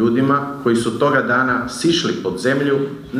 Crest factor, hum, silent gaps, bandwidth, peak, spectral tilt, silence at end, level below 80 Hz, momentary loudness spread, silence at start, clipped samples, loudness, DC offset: 14 dB; none; none; 15 kHz; -4 dBFS; -5 dB/octave; 0 s; -50 dBFS; 4 LU; 0 s; under 0.1%; -17 LUFS; under 0.1%